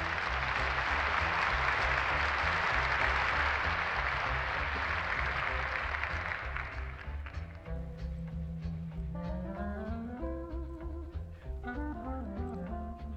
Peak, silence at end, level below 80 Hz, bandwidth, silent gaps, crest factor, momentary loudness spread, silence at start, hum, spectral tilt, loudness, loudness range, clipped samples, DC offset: -16 dBFS; 0 s; -42 dBFS; 8.2 kHz; none; 18 dB; 13 LU; 0 s; none; -5.5 dB/octave; -33 LUFS; 11 LU; under 0.1%; under 0.1%